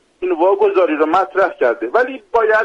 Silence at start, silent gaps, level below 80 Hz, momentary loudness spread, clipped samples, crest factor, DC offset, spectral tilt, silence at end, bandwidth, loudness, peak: 0.2 s; none; -56 dBFS; 4 LU; under 0.1%; 12 dB; under 0.1%; -5 dB/octave; 0 s; 7.8 kHz; -15 LUFS; -4 dBFS